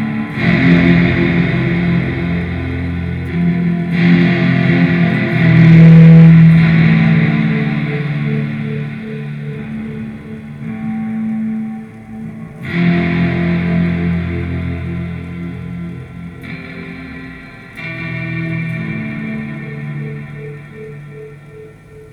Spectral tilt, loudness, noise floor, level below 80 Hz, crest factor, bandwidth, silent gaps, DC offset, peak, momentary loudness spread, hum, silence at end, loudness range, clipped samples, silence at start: -9.5 dB/octave; -13 LUFS; -36 dBFS; -38 dBFS; 14 dB; 5 kHz; none; under 0.1%; 0 dBFS; 21 LU; none; 0.05 s; 17 LU; under 0.1%; 0 s